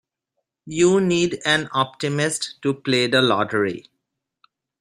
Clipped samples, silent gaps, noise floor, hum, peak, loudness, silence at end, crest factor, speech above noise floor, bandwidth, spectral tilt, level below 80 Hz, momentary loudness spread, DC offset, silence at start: under 0.1%; none; -79 dBFS; none; -4 dBFS; -20 LUFS; 1 s; 18 dB; 59 dB; 14 kHz; -4 dB/octave; -60 dBFS; 8 LU; under 0.1%; 0.65 s